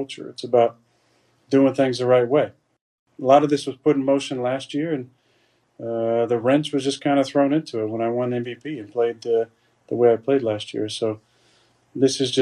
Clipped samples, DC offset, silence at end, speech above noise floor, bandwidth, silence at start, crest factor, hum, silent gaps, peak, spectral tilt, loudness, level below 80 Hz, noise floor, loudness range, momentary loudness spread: under 0.1%; under 0.1%; 0 s; 43 dB; 11.5 kHz; 0 s; 18 dB; none; 2.81-3.06 s; -4 dBFS; -5.5 dB/octave; -21 LUFS; -70 dBFS; -64 dBFS; 3 LU; 12 LU